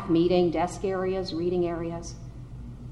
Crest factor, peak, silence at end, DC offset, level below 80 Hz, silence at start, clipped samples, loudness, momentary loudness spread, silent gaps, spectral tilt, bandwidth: 16 dB; -12 dBFS; 0 s; under 0.1%; -46 dBFS; 0 s; under 0.1%; -27 LUFS; 19 LU; none; -6.5 dB/octave; 11 kHz